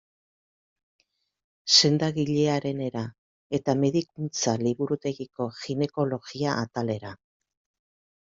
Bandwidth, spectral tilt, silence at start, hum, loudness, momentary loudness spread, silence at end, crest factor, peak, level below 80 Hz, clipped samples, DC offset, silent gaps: 8 kHz; -4.5 dB/octave; 1.65 s; none; -26 LUFS; 14 LU; 1.1 s; 24 dB; -4 dBFS; -66 dBFS; under 0.1%; under 0.1%; 3.18-3.50 s